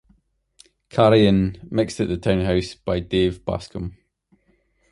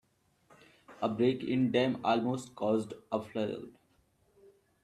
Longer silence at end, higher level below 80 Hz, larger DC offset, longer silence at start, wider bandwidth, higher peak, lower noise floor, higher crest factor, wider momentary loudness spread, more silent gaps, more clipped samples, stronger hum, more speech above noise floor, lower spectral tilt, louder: second, 1 s vs 1.15 s; first, -40 dBFS vs -72 dBFS; neither; about the same, 0.95 s vs 0.9 s; about the same, 11.5 kHz vs 12 kHz; first, -2 dBFS vs -14 dBFS; second, -64 dBFS vs -70 dBFS; about the same, 20 dB vs 20 dB; first, 13 LU vs 8 LU; neither; neither; neither; first, 44 dB vs 39 dB; about the same, -7 dB/octave vs -6.5 dB/octave; first, -21 LUFS vs -32 LUFS